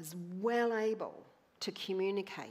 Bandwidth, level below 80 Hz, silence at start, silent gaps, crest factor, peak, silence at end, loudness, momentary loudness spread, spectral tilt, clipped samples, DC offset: 15.5 kHz; -90 dBFS; 0 s; none; 16 dB; -20 dBFS; 0 s; -36 LUFS; 11 LU; -4.5 dB/octave; under 0.1%; under 0.1%